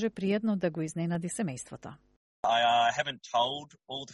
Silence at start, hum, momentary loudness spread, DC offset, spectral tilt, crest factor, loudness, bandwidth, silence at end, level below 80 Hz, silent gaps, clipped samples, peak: 0 s; none; 16 LU; under 0.1%; -4.5 dB/octave; 16 dB; -30 LUFS; 11.5 kHz; 0 s; -68 dBFS; 2.17-2.43 s; under 0.1%; -14 dBFS